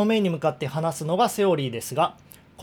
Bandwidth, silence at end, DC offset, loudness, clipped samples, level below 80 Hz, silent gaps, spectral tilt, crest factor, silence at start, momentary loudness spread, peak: over 20 kHz; 0 s; under 0.1%; -24 LUFS; under 0.1%; -66 dBFS; none; -5.5 dB/octave; 16 dB; 0 s; 6 LU; -8 dBFS